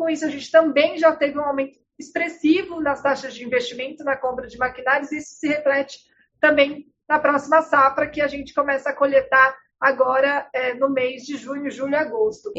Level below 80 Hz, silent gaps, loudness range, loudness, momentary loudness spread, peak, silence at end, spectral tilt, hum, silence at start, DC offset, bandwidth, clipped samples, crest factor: -58 dBFS; none; 5 LU; -20 LUFS; 11 LU; -2 dBFS; 0 s; -4 dB/octave; none; 0 s; under 0.1%; 8 kHz; under 0.1%; 18 dB